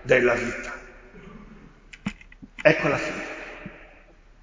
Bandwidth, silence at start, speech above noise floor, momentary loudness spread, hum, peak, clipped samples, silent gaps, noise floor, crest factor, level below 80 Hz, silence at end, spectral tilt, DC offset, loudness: 7.6 kHz; 0 s; 30 dB; 26 LU; none; -2 dBFS; under 0.1%; none; -52 dBFS; 26 dB; -50 dBFS; 0.55 s; -5.5 dB/octave; under 0.1%; -25 LUFS